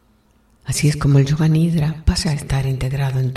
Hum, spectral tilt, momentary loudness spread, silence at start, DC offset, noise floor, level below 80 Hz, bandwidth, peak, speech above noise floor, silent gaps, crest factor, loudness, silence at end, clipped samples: none; -6 dB/octave; 6 LU; 0.65 s; under 0.1%; -56 dBFS; -30 dBFS; 14 kHz; -2 dBFS; 39 dB; none; 16 dB; -18 LUFS; 0 s; under 0.1%